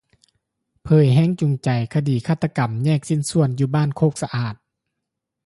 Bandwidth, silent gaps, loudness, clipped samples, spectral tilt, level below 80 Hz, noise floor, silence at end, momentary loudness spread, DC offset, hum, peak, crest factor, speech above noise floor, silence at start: 11.5 kHz; none; -20 LUFS; under 0.1%; -7 dB/octave; -52 dBFS; -81 dBFS; 0.9 s; 7 LU; under 0.1%; none; -4 dBFS; 16 dB; 62 dB; 0.85 s